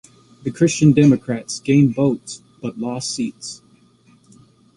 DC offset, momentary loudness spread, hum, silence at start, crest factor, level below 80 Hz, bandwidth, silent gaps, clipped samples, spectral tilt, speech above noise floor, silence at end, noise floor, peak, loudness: under 0.1%; 19 LU; none; 0.45 s; 18 dB; -54 dBFS; 11.5 kHz; none; under 0.1%; -6 dB/octave; 36 dB; 1.2 s; -53 dBFS; -2 dBFS; -18 LUFS